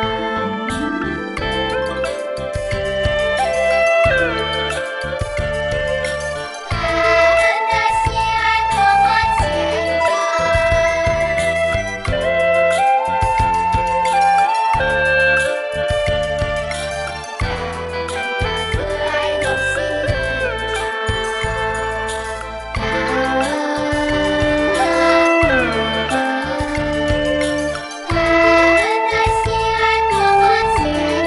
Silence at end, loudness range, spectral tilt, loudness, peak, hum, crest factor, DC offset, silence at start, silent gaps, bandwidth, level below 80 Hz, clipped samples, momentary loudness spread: 0 s; 5 LU; -4.5 dB/octave; -17 LUFS; -2 dBFS; none; 16 dB; under 0.1%; 0 s; none; 11.5 kHz; -32 dBFS; under 0.1%; 9 LU